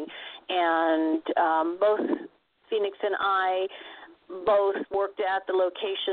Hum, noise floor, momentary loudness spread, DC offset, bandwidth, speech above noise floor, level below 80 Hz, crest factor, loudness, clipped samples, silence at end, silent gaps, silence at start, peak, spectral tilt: none; -49 dBFS; 13 LU; under 0.1%; 4.6 kHz; 23 dB; -70 dBFS; 16 dB; -26 LUFS; under 0.1%; 0 s; none; 0 s; -12 dBFS; -7.5 dB/octave